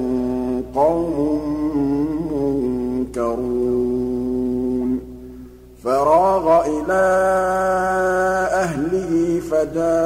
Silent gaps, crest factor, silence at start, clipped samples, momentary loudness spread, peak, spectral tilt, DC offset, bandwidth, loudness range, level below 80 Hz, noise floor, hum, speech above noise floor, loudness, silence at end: none; 14 dB; 0 s; under 0.1%; 7 LU; -4 dBFS; -6.5 dB/octave; under 0.1%; 16 kHz; 5 LU; -40 dBFS; -39 dBFS; 60 Hz at -40 dBFS; 22 dB; -19 LUFS; 0 s